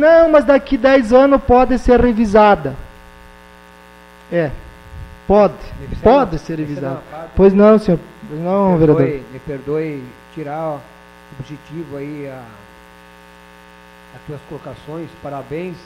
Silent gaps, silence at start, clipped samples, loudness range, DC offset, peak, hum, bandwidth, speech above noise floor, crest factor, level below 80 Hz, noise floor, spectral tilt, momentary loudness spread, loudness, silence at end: none; 0 s; under 0.1%; 20 LU; under 0.1%; 0 dBFS; 60 Hz at -45 dBFS; 12.5 kHz; 28 dB; 16 dB; -34 dBFS; -42 dBFS; -8 dB/octave; 22 LU; -14 LUFS; 0.05 s